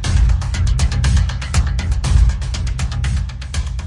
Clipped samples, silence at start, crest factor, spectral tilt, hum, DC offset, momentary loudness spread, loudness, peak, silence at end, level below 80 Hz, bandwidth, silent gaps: under 0.1%; 0 s; 14 dB; -5 dB/octave; none; under 0.1%; 7 LU; -19 LUFS; -2 dBFS; 0 s; -18 dBFS; 11 kHz; none